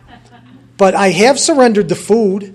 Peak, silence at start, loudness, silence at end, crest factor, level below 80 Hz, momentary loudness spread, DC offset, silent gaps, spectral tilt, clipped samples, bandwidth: 0 dBFS; 0.8 s; -11 LUFS; 0 s; 12 dB; -52 dBFS; 4 LU; under 0.1%; none; -4 dB/octave; under 0.1%; 13.5 kHz